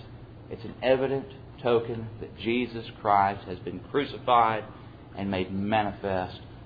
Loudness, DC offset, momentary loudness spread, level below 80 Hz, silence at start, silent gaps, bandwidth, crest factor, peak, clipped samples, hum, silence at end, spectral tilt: -28 LUFS; under 0.1%; 19 LU; -54 dBFS; 0 s; none; 5 kHz; 20 dB; -8 dBFS; under 0.1%; none; 0 s; -9 dB/octave